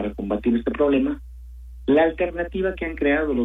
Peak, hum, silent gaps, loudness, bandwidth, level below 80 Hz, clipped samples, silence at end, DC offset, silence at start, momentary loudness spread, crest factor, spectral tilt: -8 dBFS; none; none; -22 LUFS; 4 kHz; -38 dBFS; under 0.1%; 0 s; under 0.1%; 0 s; 15 LU; 14 dB; -8.5 dB/octave